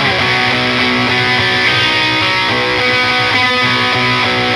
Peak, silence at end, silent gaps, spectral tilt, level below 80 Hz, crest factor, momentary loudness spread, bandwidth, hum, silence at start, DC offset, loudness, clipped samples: 0 dBFS; 0 s; none; -4 dB/octave; -42 dBFS; 12 dB; 1 LU; 15 kHz; none; 0 s; under 0.1%; -11 LUFS; under 0.1%